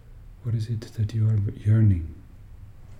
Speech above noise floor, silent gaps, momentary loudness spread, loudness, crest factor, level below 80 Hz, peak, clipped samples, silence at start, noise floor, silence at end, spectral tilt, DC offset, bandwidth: 21 dB; none; 11 LU; -25 LUFS; 14 dB; -44 dBFS; -10 dBFS; under 0.1%; 0.1 s; -44 dBFS; 0 s; -9 dB/octave; under 0.1%; 6.2 kHz